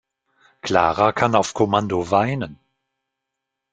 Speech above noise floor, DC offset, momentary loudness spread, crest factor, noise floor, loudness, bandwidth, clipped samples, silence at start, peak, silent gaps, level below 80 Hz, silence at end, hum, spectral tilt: 62 dB; under 0.1%; 11 LU; 20 dB; -81 dBFS; -19 LUFS; 9.4 kHz; under 0.1%; 0.65 s; -2 dBFS; none; -54 dBFS; 1.2 s; none; -5.5 dB/octave